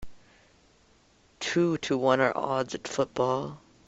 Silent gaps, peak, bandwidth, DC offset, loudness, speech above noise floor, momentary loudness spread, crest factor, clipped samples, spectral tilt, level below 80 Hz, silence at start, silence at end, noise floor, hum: none; -8 dBFS; 8.2 kHz; under 0.1%; -28 LUFS; 35 dB; 8 LU; 22 dB; under 0.1%; -5 dB/octave; -60 dBFS; 0 s; 0.3 s; -62 dBFS; none